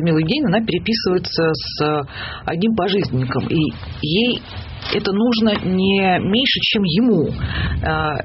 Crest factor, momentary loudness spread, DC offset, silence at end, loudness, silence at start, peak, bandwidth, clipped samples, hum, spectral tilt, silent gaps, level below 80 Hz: 12 dB; 7 LU; under 0.1%; 0 s; -18 LUFS; 0 s; -6 dBFS; 6 kHz; under 0.1%; none; -8 dB/octave; none; -36 dBFS